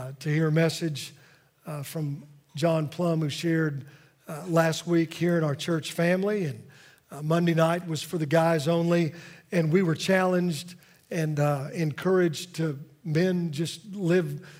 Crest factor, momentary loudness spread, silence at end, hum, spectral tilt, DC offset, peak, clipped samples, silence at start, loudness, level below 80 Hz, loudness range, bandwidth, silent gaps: 18 dB; 14 LU; 0 s; none; -6.5 dB/octave; under 0.1%; -8 dBFS; under 0.1%; 0 s; -26 LUFS; -72 dBFS; 4 LU; 16 kHz; none